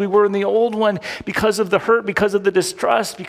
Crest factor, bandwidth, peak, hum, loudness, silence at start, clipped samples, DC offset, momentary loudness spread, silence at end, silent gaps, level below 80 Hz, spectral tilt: 14 dB; 16 kHz; -4 dBFS; none; -18 LUFS; 0 s; under 0.1%; under 0.1%; 3 LU; 0 s; none; -50 dBFS; -4.5 dB/octave